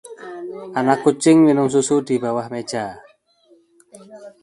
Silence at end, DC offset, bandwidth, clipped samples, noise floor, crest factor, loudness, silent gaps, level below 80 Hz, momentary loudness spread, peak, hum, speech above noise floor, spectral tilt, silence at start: 0.15 s; under 0.1%; 11.5 kHz; under 0.1%; -56 dBFS; 18 dB; -18 LUFS; none; -64 dBFS; 19 LU; -2 dBFS; none; 38 dB; -5.5 dB/octave; 0.1 s